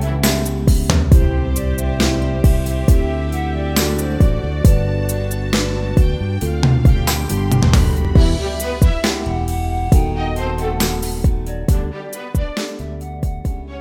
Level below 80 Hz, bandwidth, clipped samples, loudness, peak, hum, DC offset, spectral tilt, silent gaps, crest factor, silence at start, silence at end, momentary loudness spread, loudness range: -20 dBFS; 18 kHz; under 0.1%; -18 LUFS; 0 dBFS; none; under 0.1%; -6 dB/octave; none; 16 dB; 0 s; 0 s; 9 LU; 4 LU